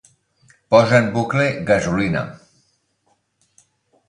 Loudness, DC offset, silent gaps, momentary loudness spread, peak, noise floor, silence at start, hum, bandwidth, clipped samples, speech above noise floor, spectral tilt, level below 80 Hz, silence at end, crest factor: -17 LUFS; under 0.1%; none; 9 LU; 0 dBFS; -66 dBFS; 0.7 s; none; 10.5 kHz; under 0.1%; 49 dB; -6 dB/octave; -50 dBFS; 1.75 s; 20 dB